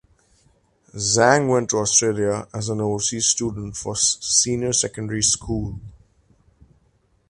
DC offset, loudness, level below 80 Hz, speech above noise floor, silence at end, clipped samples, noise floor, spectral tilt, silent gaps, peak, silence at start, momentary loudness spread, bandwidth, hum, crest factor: under 0.1%; -20 LUFS; -46 dBFS; 41 dB; 1.4 s; under 0.1%; -62 dBFS; -3 dB/octave; none; 0 dBFS; 0.95 s; 11 LU; 11.5 kHz; none; 22 dB